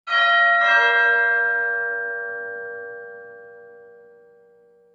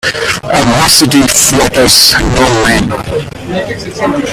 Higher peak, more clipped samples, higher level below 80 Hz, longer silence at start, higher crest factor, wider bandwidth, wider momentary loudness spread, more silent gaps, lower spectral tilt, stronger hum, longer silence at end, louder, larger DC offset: second, -6 dBFS vs 0 dBFS; second, under 0.1% vs 0.7%; second, -82 dBFS vs -26 dBFS; about the same, 0.05 s vs 0.05 s; first, 16 dB vs 10 dB; second, 7.4 kHz vs over 20 kHz; first, 21 LU vs 13 LU; neither; second, -0.5 dB/octave vs -3 dB/octave; neither; first, 1.2 s vs 0 s; second, -18 LUFS vs -8 LUFS; neither